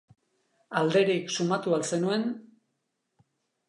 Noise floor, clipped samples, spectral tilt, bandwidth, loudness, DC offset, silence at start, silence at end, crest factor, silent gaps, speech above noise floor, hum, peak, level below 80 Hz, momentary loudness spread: -79 dBFS; under 0.1%; -5 dB/octave; 11 kHz; -27 LUFS; under 0.1%; 0.7 s; 1.25 s; 20 dB; none; 53 dB; none; -10 dBFS; -80 dBFS; 9 LU